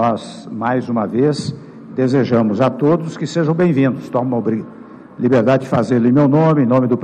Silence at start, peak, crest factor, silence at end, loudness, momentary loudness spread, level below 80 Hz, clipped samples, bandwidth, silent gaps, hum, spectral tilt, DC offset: 0 s; -4 dBFS; 10 dB; 0 s; -16 LUFS; 11 LU; -58 dBFS; under 0.1%; 9.8 kHz; none; none; -8 dB/octave; under 0.1%